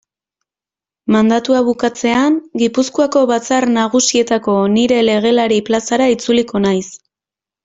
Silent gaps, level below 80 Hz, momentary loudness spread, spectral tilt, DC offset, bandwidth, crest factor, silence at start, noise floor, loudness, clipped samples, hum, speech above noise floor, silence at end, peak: none; -54 dBFS; 4 LU; -4 dB/octave; under 0.1%; 8 kHz; 12 dB; 1.05 s; -89 dBFS; -14 LUFS; under 0.1%; none; 76 dB; 0.7 s; -2 dBFS